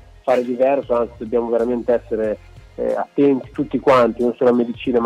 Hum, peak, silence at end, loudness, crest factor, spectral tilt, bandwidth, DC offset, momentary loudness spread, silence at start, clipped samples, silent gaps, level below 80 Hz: none; -4 dBFS; 0 s; -19 LUFS; 14 dB; -7.5 dB/octave; 10 kHz; under 0.1%; 8 LU; 0.25 s; under 0.1%; none; -46 dBFS